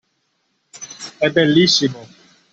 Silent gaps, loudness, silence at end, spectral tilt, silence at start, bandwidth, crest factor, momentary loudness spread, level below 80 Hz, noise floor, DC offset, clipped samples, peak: none; -15 LUFS; 0.5 s; -4 dB/octave; 0.75 s; 8.2 kHz; 18 dB; 23 LU; -58 dBFS; -68 dBFS; under 0.1%; under 0.1%; -2 dBFS